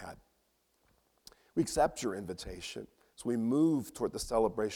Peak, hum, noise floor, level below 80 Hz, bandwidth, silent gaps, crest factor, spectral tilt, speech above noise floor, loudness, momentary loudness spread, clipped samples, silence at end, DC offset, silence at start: -16 dBFS; none; -75 dBFS; -56 dBFS; 17.5 kHz; none; 18 dB; -5 dB/octave; 43 dB; -33 LUFS; 14 LU; under 0.1%; 0 s; under 0.1%; 0 s